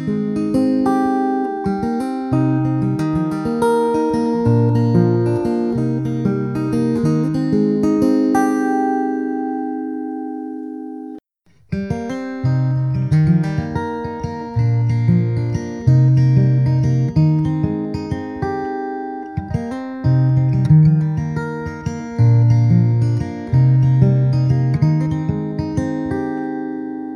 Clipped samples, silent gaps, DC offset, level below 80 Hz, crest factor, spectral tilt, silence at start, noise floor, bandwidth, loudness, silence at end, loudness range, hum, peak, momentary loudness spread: under 0.1%; none; under 0.1%; -42 dBFS; 16 dB; -9.5 dB/octave; 0 s; -55 dBFS; 11 kHz; -18 LUFS; 0 s; 5 LU; none; -2 dBFS; 12 LU